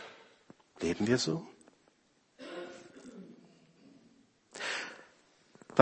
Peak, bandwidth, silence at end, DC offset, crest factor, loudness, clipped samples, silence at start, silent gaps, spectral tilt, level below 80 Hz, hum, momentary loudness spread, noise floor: -2 dBFS; 8.4 kHz; 0 s; under 0.1%; 34 dB; -35 LUFS; under 0.1%; 0 s; none; -4.5 dB/octave; -70 dBFS; none; 26 LU; -71 dBFS